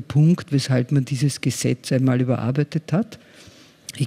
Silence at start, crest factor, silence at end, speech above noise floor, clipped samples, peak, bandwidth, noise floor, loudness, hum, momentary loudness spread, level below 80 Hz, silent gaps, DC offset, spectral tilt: 0 s; 14 dB; 0 s; 21 dB; under 0.1%; -8 dBFS; 15.5 kHz; -41 dBFS; -21 LUFS; none; 7 LU; -62 dBFS; none; under 0.1%; -6.5 dB/octave